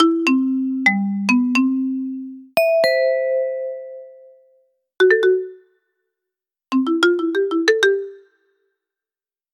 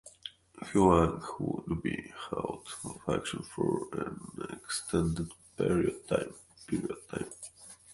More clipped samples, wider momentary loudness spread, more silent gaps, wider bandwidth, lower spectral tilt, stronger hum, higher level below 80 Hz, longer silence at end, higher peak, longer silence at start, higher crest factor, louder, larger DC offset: neither; second, 13 LU vs 17 LU; neither; first, 16 kHz vs 11.5 kHz; about the same, -5 dB/octave vs -5.5 dB/octave; neither; second, -80 dBFS vs -50 dBFS; first, 1.35 s vs 0 s; first, -4 dBFS vs -10 dBFS; about the same, 0 s vs 0.05 s; second, 16 dB vs 24 dB; first, -18 LUFS vs -33 LUFS; neither